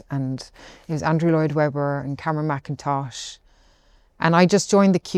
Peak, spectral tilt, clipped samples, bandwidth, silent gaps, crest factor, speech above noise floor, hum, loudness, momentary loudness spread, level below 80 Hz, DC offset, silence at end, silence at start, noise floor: -2 dBFS; -6 dB/octave; under 0.1%; 11.5 kHz; none; 20 dB; 36 dB; none; -21 LUFS; 15 LU; -56 dBFS; under 0.1%; 0 s; 0.1 s; -56 dBFS